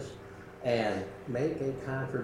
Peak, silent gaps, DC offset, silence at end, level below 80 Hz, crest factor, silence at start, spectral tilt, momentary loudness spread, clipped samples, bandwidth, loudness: -14 dBFS; none; under 0.1%; 0 s; -60 dBFS; 18 dB; 0 s; -6.5 dB/octave; 15 LU; under 0.1%; 14 kHz; -33 LUFS